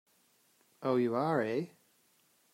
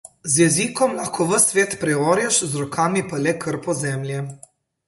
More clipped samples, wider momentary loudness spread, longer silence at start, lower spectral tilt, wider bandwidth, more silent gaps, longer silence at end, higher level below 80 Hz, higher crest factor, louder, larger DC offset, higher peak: neither; about the same, 9 LU vs 9 LU; first, 0.8 s vs 0.25 s; first, -7.5 dB/octave vs -4 dB/octave; first, 16 kHz vs 12 kHz; neither; first, 0.85 s vs 0.5 s; second, -84 dBFS vs -60 dBFS; about the same, 18 dB vs 18 dB; second, -33 LUFS vs -20 LUFS; neither; second, -18 dBFS vs -2 dBFS